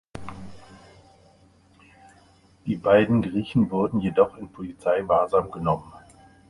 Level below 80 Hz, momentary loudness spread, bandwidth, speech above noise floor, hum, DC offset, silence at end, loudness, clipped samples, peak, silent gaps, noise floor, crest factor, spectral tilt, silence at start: -52 dBFS; 20 LU; 11 kHz; 34 dB; none; under 0.1%; 0.5 s; -23 LUFS; under 0.1%; -6 dBFS; none; -57 dBFS; 20 dB; -8.5 dB/octave; 0.15 s